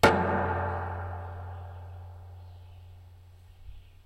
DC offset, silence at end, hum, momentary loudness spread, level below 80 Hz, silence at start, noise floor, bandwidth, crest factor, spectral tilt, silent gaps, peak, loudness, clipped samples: under 0.1%; 0.05 s; none; 24 LU; -50 dBFS; 0 s; -52 dBFS; 16 kHz; 26 dB; -5.5 dB/octave; none; -6 dBFS; -31 LUFS; under 0.1%